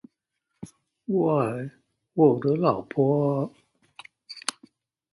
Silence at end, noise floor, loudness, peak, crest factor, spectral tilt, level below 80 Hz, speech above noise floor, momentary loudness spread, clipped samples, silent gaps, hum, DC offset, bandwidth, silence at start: 0.7 s; -79 dBFS; -25 LUFS; -8 dBFS; 20 dB; -7 dB/octave; -68 dBFS; 57 dB; 23 LU; under 0.1%; none; none; under 0.1%; 11.5 kHz; 0.6 s